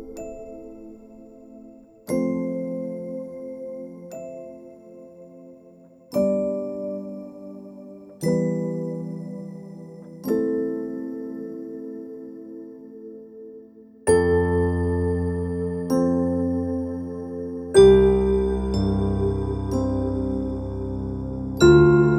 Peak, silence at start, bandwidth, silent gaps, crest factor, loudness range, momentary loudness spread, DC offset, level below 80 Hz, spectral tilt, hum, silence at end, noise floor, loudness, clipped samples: -2 dBFS; 0 s; 15 kHz; none; 22 dB; 12 LU; 22 LU; under 0.1%; -38 dBFS; -7.5 dB/octave; none; 0 s; -50 dBFS; -23 LUFS; under 0.1%